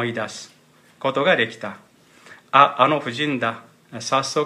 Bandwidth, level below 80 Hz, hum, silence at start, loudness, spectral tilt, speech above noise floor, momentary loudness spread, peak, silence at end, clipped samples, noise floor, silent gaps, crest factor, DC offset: 14 kHz; -72 dBFS; none; 0 s; -20 LUFS; -4 dB/octave; 28 dB; 19 LU; 0 dBFS; 0 s; under 0.1%; -48 dBFS; none; 22 dB; under 0.1%